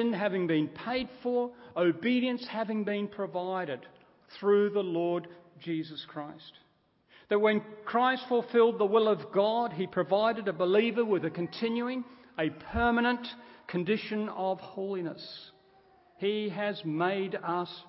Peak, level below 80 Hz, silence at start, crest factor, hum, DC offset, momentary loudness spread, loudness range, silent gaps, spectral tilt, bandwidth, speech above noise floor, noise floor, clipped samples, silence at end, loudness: -12 dBFS; -58 dBFS; 0 s; 18 dB; none; under 0.1%; 13 LU; 7 LU; none; -9.5 dB/octave; 5.8 kHz; 38 dB; -68 dBFS; under 0.1%; 0.05 s; -30 LUFS